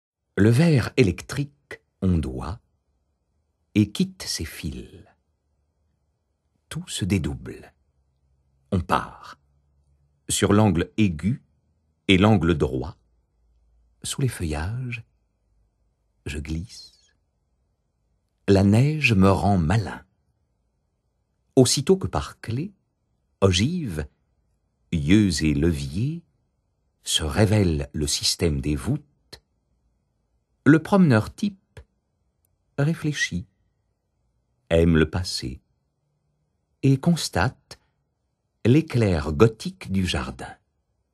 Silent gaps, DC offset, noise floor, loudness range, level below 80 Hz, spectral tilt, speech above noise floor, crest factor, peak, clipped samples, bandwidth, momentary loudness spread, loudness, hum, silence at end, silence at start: none; under 0.1%; -74 dBFS; 10 LU; -42 dBFS; -5.5 dB/octave; 53 dB; 24 dB; 0 dBFS; under 0.1%; 12.5 kHz; 17 LU; -22 LUFS; none; 0.6 s; 0.35 s